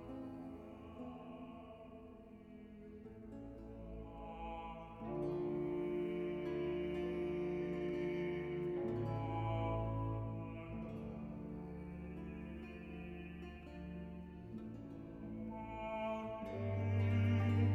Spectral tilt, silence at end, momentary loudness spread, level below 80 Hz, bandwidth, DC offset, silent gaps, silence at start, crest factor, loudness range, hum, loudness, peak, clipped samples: -9.5 dB/octave; 0 s; 14 LU; -58 dBFS; 6 kHz; under 0.1%; none; 0 s; 18 dB; 12 LU; none; -43 LUFS; -24 dBFS; under 0.1%